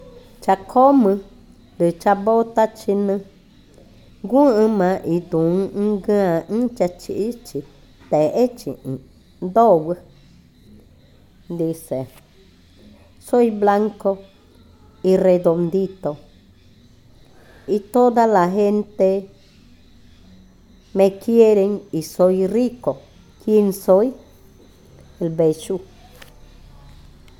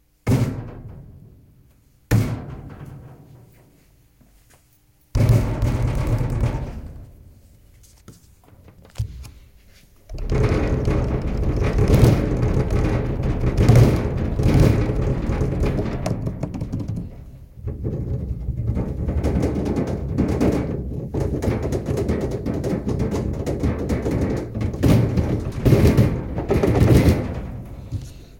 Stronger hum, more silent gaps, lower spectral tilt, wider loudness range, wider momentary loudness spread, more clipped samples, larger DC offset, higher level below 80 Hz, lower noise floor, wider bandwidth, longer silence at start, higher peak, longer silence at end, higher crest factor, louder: neither; neither; about the same, -7.5 dB/octave vs -8 dB/octave; second, 4 LU vs 11 LU; second, 14 LU vs 18 LU; neither; neither; second, -52 dBFS vs -28 dBFS; second, -50 dBFS vs -57 dBFS; about the same, 18.5 kHz vs 17 kHz; second, 0.05 s vs 0.25 s; about the same, -2 dBFS vs -2 dBFS; first, 1.55 s vs 0.05 s; about the same, 18 dB vs 20 dB; first, -18 LUFS vs -21 LUFS